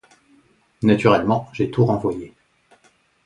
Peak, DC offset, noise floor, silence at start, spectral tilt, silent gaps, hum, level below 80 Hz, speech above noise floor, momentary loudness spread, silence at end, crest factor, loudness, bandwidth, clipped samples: 0 dBFS; under 0.1%; -59 dBFS; 0.8 s; -8 dB/octave; none; none; -52 dBFS; 41 dB; 12 LU; 1 s; 20 dB; -19 LUFS; 10.5 kHz; under 0.1%